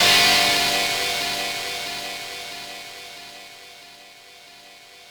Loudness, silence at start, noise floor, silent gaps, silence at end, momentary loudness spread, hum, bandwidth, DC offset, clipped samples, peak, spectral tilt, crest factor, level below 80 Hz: -20 LUFS; 0 s; -46 dBFS; none; 0 s; 26 LU; none; over 20 kHz; under 0.1%; under 0.1%; -4 dBFS; -0.5 dB/octave; 20 dB; -54 dBFS